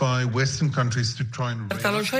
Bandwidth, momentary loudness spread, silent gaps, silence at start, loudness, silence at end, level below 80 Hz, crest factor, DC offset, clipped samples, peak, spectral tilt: 15.5 kHz; 5 LU; none; 0 s; -25 LUFS; 0 s; -54 dBFS; 16 dB; under 0.1%; under 0.1%; -8 dBFS; -5 dB/octave